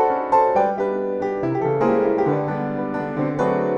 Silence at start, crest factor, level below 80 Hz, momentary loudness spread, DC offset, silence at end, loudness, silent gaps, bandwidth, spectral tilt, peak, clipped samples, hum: 0 s; 14 dB; -56 dBFS; 7 LU; under 0.1%; 0 s; -21 LUFS; none; 8.2 kHz; -9 dB/octave; -6 dBFS; under 0.1%; none